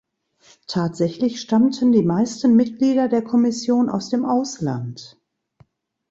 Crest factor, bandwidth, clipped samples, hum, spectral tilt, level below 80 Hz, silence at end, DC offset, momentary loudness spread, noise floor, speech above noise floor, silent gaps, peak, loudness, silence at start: 14 dB; 7.8 kHz; under 0.1%; none; -6.5 dB/octave; -62 dBFS; 1.05 s; under 0.1%; 9 LU; -57 dBFS; 38 dB; none; -6 dBFS; -19 LUFS; 0.7 s